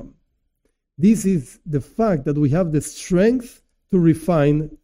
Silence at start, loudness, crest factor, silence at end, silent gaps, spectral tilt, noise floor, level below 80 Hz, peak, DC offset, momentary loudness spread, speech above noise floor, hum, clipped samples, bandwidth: 0 s; -19 LUFS; 14 dB; 0.1 s; none; -7.5 dB/octave; -70 dBFS; -42 dBFS; -6 dBFS; under 0.1%; 8 LU; 52 dB; none; under 0.1%; 16 kHz